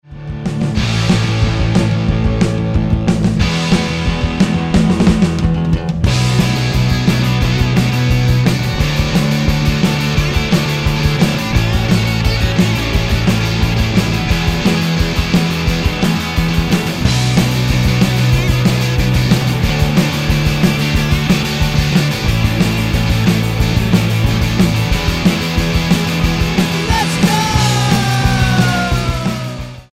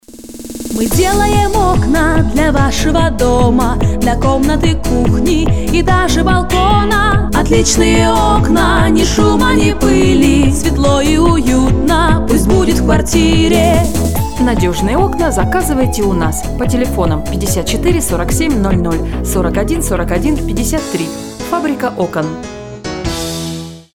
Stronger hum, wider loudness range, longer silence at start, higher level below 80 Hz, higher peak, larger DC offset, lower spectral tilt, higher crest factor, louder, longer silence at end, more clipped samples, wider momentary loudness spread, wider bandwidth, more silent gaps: neither; second, 1 LU vs 5 LU; about the same, 0.1 s vs 0 s; about the same, -22 dBFS vs -18 dBFS; about the same, 0 dBFS vs 0 dBFS; second, under 0.1% vs 3%; about the same, -5.5 dB/octave vs -5 dB/octave; about the same, 12 dB vs 12 dB; about the same, -14 LUFS vs -12 LUFS; about the same, 0.1 s vs 0 s; neither; second, 3 LU vs 8 LU; second, 16 kHz vs 19 kHz; neither